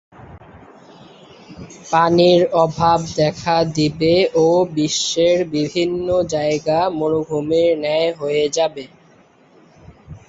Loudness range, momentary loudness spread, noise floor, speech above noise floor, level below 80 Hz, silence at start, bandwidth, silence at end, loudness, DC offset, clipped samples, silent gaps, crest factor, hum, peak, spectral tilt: 4 LU; 6 LU; -51 dBFS; 34 dB; -50 dBFS; 0.2 s; 8 kHz; 0.1 s; -17 LUFS; under 0.1%; under 0.1%; none; 16 dB; none; -2 dBFS; -5 dB/octave